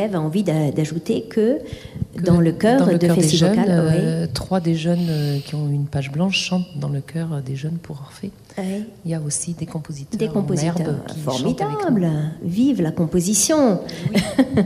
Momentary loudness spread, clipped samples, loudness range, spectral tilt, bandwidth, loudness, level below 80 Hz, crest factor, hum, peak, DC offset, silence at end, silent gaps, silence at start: 13 LU; under 0.1%; 8 LU; -5.5 dB/octave; 15 kHz; -20 LUFS; -48 dBFS; 16 dB; none; -4 dBFS; under 0.1%; 0 s; none; 0 s